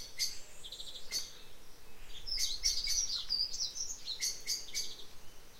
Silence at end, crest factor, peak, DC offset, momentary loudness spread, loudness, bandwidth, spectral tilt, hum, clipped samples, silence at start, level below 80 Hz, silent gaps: 0 s; 20 dB; -18 dBFS; under 0.1%; 20 LU; -35 LUFS; 16 kHz; 1.5 dB/octave; none; under 0.1%; 0 s; -52 dBFS; none